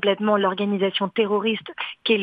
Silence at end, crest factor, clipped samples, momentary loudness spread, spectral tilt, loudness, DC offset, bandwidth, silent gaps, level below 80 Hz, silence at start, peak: 0 s; 16 dB; under 0.1%; 7 LU; -8 dB/octave; -22 LUFS; under 0.1%; 5 kHz; none; -70 dBFS; 0 s; -6 dBFS